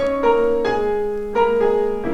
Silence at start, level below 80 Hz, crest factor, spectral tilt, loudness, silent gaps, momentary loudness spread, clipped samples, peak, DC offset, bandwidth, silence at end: 0 s; -40 dBFS; 14 dB; -6 dB/octave; -19 LUFS; none; 5 LU; under 0.1%; -6 dBFS; under 0.1%; 8 kHz; 0 s